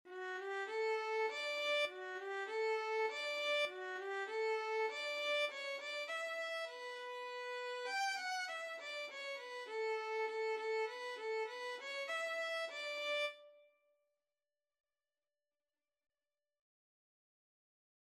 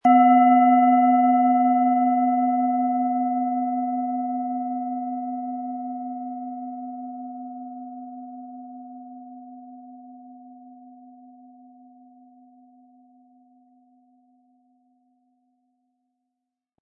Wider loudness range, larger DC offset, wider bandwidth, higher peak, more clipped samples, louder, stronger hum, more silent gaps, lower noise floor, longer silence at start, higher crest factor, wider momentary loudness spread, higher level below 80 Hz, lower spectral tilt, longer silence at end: second, 4 LU vs 25 LU; neither; first, 13.5 kHz vs 3 kHz; second, -28 dBFS vs -6 dBFS; neither; second, -41 LUFS vs -21 LUFS; neither; neither; first, under -90 dBFS vs -84 dBFS; about the same, 0.05 s vs 0.05 s; about the same, 16 dB vs 18 dB; second, 8 LU vs 25 LU; about the same, under -90 dBFS vs -86 dBFS; second, 1 dB/octave vs -8 dB/octave; second, 4.5 s vs 5.9 s